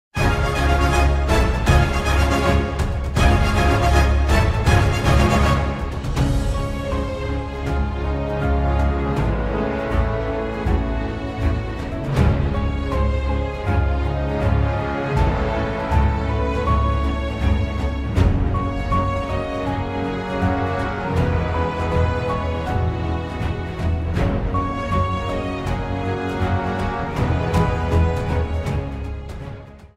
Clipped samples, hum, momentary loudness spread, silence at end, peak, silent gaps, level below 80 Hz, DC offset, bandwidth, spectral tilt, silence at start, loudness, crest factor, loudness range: under 0.1%; none; 7 LU; 0.1 s; -2 dBFS; none; -24 dBFS; under 0.1%; 14 kHz; -6.5 dB/octave; 0.15 s; -21 LUFS; 18 dB; 5 LU